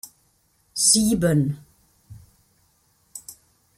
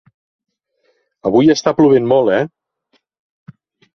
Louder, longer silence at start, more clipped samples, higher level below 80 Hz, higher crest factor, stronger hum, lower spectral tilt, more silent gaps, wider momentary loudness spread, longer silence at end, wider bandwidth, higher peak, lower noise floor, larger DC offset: second, -19 LUFS vs -13 LUFS; second, 0.05 s vs 1.25 s; neither; about the same, -52 dBFS vs -56 dBFS; first, 22 dB vs 16 dB; neither; second, -4 dB/octave vs -6 dB/octave; neither; first, 26 LU vs 10 LU; second, 0.45 s vs 1.5 s; first, 16 kHz vs 6.6 kHz; about the same, -4 dBFS vs -2 dBFS; about the same, -64 dBFS vs -64 dBFS; neither